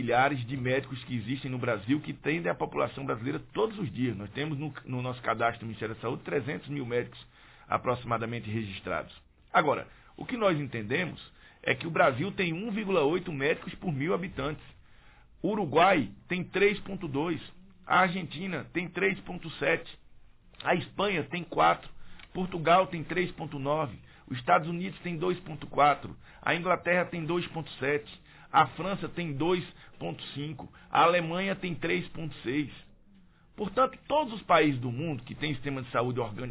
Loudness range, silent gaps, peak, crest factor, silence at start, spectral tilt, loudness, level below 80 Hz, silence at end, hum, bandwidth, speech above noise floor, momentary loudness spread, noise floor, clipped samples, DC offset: 4 LU; none; -10 dBFS; 20 dB; 0 s; -4 dB/octave; -30 LUFS; -58 dBFS; 0 s; none; 4 kHz; 28 dB; 12 LU; -58 dBFS; under 0.1%; under 0.1%